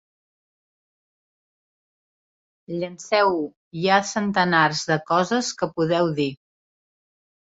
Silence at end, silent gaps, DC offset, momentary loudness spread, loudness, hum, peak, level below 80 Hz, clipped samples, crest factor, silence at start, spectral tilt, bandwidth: 1.2 s; 3.57-3.71 s; under 0.1%; 11 LU; -22 LUFS; none; -4 dBFS; -66 dBFS; under 0.1%; 20 dB; 2.7 s; -4.5 dB/octave; 8 kHz